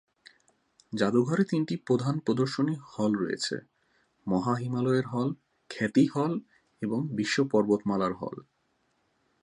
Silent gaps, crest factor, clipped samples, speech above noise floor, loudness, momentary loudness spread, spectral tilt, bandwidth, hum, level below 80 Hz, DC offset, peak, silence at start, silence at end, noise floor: none; 18 dB; under 0.1%; 45 dB; -29 LUFS; 12 LU; -6.5 dB/octave; 11 kHz; none; -68 dBFS; under 0.1%; -10 dBFS; 0.9 s; 1 s; -73 dBFS